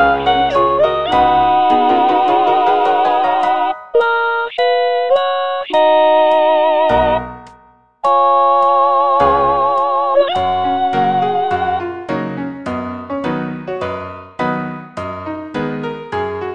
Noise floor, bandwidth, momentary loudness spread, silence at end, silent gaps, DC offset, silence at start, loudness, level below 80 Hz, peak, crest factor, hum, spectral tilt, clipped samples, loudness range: -48 dBFS; 8.6 kHz; 12 LU; 0 s; none; under 0.1%; 0 s; -14 LUFS; -42 dBFS; 0 dBFS; 14 dB; none; -6.5 dB/octave; under 0.1%; 9 LU